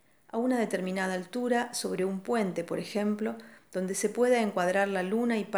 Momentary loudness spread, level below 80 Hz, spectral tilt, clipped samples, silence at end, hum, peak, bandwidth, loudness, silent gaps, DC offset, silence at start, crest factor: 8 LU; -80 dBFS; -5 dB/octave; under 0.1%; 0 s; none; -14 dBFS; over 20 kHz; -30 LUFS; none; under 0.1%; 0.35 s; 16 dB